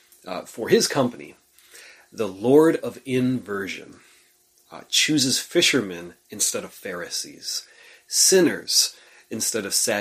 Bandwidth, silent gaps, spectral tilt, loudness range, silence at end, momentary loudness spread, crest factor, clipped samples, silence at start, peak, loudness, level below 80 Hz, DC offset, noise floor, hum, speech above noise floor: 15.5 kHz; none; -2.5 dB/octave; 3 LU; 0 s; 17 LU; 20 dB; under 0.1%; 0.25 s; -4 dBFS; -21 LUFS; -66 dBFS; under 0.1%; -60 dBFS; none; 37 dB